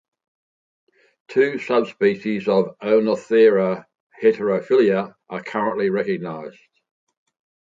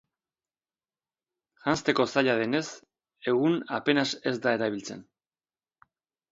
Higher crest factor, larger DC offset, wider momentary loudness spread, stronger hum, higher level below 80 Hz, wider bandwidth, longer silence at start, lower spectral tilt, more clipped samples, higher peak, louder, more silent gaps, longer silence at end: second, 16 dB vs 22 dB; neither; about the same, 14 LU vs 14 LU; neither; about the same, -70 dBFS vs -70 dBFS; about the same, 7.6 kHz vs 7.8 kHz; second, 1.3 s vs 1.65 s; first, -7 dB/octave vs -4.5 dB/octave; neither; first, -4 dBFS vs -8 dBFS; first, -20 LUFS vs -27 LUFS; first, 4.00-4.10 s vs none; about the same, 1.2 s vs 1.3 s